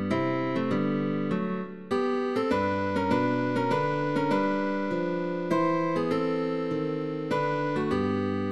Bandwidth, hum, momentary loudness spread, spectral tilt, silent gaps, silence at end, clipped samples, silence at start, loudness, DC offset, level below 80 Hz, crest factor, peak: 12 kHz; none; 4 LU; -7.5 dB/octave; none; 0 s; under 0.1%; 0 s; -28 LUFS; 0.4%; -62 dBFS; 14 dB; -12 dBFS